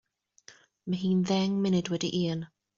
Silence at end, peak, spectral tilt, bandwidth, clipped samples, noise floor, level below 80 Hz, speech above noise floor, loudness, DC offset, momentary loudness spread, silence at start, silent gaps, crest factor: 0.3 s; -14 dBFS; -6.5 dB/octave; 7.4 kHz; under 0.1%; -58 dBFS; -66 dBFS; 30 dB; -29 LUFS; under 0.1%; 9 LU; 0.5 s; none; 16 dB